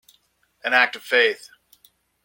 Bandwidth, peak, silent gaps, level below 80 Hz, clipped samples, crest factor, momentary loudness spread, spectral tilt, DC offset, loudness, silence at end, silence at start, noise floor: 17 kHz; -2 dBFS; none; -78 dBFS; under 0.1%; 22 dB; 13 LU; -1 dB/octave; under 0.1%; -19 LUFS; 0.9 s; 0.65 s; -64 dBFS